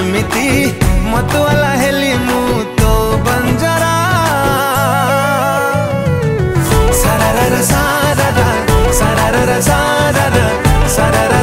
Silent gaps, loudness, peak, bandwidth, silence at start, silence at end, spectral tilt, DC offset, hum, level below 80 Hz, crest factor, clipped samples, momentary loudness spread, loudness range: none; -12 LUFS; 0 dBFS; 16.5 kHz; 0 s; 0 s; -5 dB/octave; under 0.1%; none; -20 dBFS; 12 dB; under 0.1%; 3 LU; 1 LU